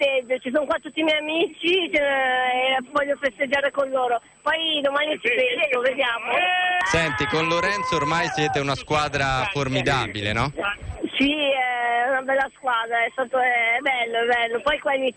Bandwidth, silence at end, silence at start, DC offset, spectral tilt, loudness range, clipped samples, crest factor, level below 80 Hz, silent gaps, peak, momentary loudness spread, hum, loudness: 10 kHz; 0.05 s; 0 s; under 0.1%; -4 dB/octave; 2 LU; under 0.1%; 14 dB; -48 dBFS; none; -10 dBFS; 4 LU; none; -22 LUFS